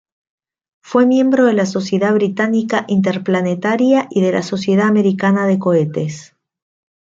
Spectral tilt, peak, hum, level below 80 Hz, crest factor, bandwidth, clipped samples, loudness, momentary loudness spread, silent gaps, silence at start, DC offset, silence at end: -7 dB/octave; -2 dBFS; none; -62 dBFS; 14 dB; 7.8 kHz; under 0.1%; -15 LUFS; 6 LU; none; 0.85 s; under 0.1%; 0.95 s